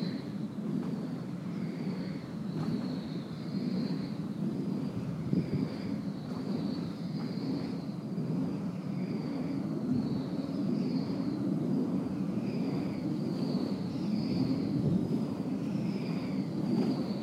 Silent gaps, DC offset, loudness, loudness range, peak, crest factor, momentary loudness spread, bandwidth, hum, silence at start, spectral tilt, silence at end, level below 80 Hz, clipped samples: none; under 0.1%; -34 LUFS; 3 LU; -16 dBFS; 16 dB; 6 LU; 12.5 kHz; none; 0 s; -8.5 dB/octave; 0 s; -64 dBFS; under 0.1%